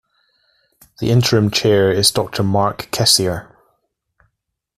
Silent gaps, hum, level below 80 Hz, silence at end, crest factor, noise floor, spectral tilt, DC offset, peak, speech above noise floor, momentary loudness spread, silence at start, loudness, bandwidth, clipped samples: none; none; -48 dBFS; 1.35 s; 18 dB; -75 dBFS; -4 dB/octave; under 0.1%; 0 dBFS; 59 dB; 8 LU; 1 s; -15 LUFS; 15.5 kHz; under 0.1%